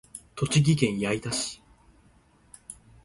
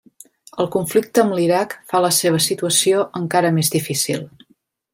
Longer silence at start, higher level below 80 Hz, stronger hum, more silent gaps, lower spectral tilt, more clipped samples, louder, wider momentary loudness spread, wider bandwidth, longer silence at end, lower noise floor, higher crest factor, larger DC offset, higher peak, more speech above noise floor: second, 0.15 s vs 0.55 s; first, -56 dBFS vs -62 dBFS; neither; neither; about the same, -5 dB/octave vs -4 dB/octave; neither; second, -26 LUFS vs -18 LUFS; first, 23 LU vs 7 LU; second, 11.5 kHz vs 16.5 kHz; second, 0.3 s vs 0.65 s; about the same, -60 dBFS vs -61 dBFS; first, 22 dB vs 16 dB; neither; second, -8 dBFS vs -2 dBFS; second, 35 dB vs 43 dB